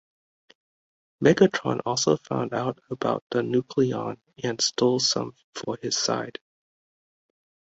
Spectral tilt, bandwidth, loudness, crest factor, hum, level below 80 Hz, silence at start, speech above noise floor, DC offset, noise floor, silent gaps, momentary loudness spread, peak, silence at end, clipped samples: -4 dB/octave; 8 kHz; -25 LUFS; 22 dB; none; -64 dBFS; 1.2 s; over 65 dB; under 0.1%; under -90 dBFS; 3.22-3.30 s, 5.44-5.53 s; 12 LU; -4 dBFS; 1.45 s; under 0.1%